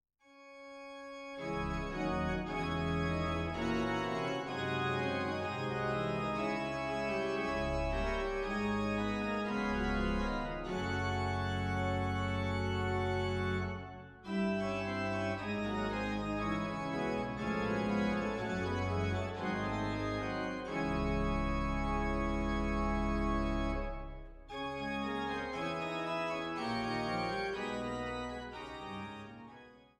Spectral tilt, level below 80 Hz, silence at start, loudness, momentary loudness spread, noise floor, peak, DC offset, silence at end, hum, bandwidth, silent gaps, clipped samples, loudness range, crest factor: -6.5 dB/octave; -46 dBFS; 0.3 s; -36 LUFS; 9 LU; -57 dBFS; -22 dBFS; under 0.1%; 0.2 s; none; 11.5 kHz; none; under 0.1%; 2 LU; 14 dB